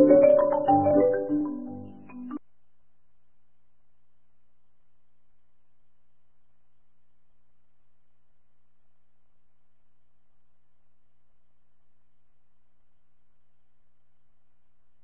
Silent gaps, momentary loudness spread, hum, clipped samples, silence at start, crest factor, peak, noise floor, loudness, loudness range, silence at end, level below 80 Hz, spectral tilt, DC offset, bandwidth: none; 24 LU; 60 Hz at -80 dBFS; under 0.1%; 0 s; 24 dB; -6 dBFS; -73 dBFS; -22 LUFS; 24 LU; 12.65 s; -66 dBFS; -11.5 dB/octave; 0.4%; 3.1 kHz